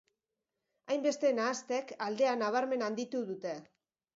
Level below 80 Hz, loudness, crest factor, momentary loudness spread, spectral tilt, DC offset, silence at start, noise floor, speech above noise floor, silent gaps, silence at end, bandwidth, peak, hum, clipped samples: -86 dBFS; -34 LUFS; 16 dB; 9 LU; -3.5 dB/octave; under 0.1%; 0.85 s; -88 dBFS; 55 dB; none; 0.5 s; 7.8 kHz; -18 dBFS; none; under 0.1%